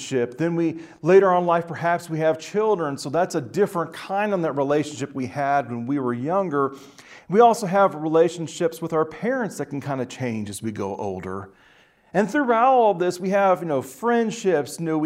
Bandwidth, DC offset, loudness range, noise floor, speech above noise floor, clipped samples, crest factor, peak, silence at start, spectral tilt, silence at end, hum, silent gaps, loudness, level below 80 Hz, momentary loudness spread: 16 kHz; under 0.1%; 6 LU; -56 dBFS; 34 dB; under 0.1%; 18 dB; -4 dBFS; 0 s; -6 dB/octave; 0 s; none; none; -22 LUFS; -66 dBFS; 12 LU